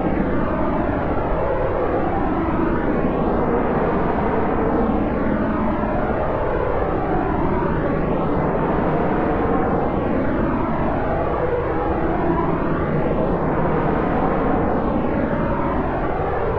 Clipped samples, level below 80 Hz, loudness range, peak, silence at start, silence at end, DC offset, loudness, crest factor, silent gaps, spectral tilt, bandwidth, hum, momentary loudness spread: under 0.1%; -30 dBFS; 1 LU; -6 dBFS; 0 s; 0 s; 2%; -21 LUFS; 12 dB; none; -10.5 dB/octave; 5.4 kHz; none; 2 LU